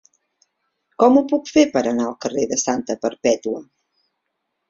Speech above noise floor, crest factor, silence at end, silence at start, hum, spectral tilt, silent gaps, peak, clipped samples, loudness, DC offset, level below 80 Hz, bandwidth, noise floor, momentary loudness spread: 58 dB; 18 dB; 1.05 s; 1 s; none; -3.5 dB/octave; none; -2 dBFS; under 0.1%; -19 LUFS; under 0.1%; -60 dBFS; 7.8 kHz; -76 dBFS; 9 LU